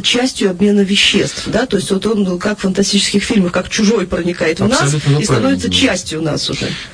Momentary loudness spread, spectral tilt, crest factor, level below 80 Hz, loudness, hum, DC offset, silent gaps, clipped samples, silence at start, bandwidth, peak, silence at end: 6 LU; -4 dB/octave; 14 dB; -38 dBFS; -14 LUFS; none; under 0.1%; none; under 0.1%; 0 s; 10.5 kHz; 0 dBFS; 0 s